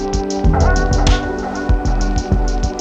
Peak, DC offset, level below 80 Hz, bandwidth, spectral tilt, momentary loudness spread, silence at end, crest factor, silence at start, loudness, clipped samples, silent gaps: 0 dBFS; under 0.1%; -16 dBFS; 8.4 kHz; -5.5 dB/octave; 5 LU; 0 s; 14 dB; 0 s; -17 LUFS; under 0.1%; none